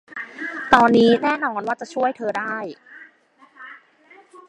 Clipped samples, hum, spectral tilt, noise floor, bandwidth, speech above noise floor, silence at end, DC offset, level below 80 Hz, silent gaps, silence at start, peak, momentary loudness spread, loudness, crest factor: under 0.1%; none; -5.5 dB/octave; -54 dBFS; 10 kHz; 35 dB; 0.1 s; under 0.1%; -56 dBFS; none; 0.1 s; 0 dBFS; 26 LU; -19 LUFS; 22 dB